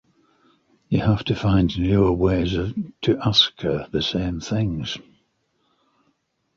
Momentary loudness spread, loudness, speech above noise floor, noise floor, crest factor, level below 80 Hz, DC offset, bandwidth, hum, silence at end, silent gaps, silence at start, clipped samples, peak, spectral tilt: 9 LU; -21 LUFS; 48 dB; -69 dBFS; 20 dB; -38 dBFS; under 0.1%; 7.2 kHz; none; 1.55 s; none; 0.9 s; under 0.1%; -4 dBFS; -6.5 dB/octave